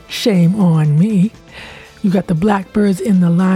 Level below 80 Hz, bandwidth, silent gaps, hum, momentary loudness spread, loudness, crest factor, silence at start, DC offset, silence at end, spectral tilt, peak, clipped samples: -46 dBFS; 14.5 kHz; none; none; 19 LU; -14 LUFS; 12 dB; 0.1 s; under 0.1%; 0 s; -7.5 dB/octave; -2 dBFS; under 0.1%